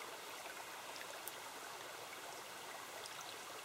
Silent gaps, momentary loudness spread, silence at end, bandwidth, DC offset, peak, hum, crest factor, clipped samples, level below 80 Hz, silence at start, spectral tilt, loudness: none; 1 LU; 0 s; 16 kHz; under 0.1%; -22 dBFS; none; 28 dB; under 0.1%; -86 dBFS; 0 s; -0.5 dB/octave; -49 LUFS